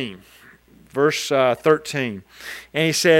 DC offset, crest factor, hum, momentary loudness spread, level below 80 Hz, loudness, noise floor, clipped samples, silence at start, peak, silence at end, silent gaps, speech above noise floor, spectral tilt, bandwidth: under 0.1%; 18 dB; none; 16 LU; -62 dBFS; -21 LUFS; -50 dBFS; under 0.1%; 0 s; -2 dBFS; 0 s; none; 30 dB; -4 dB/octave; 16.5 kHz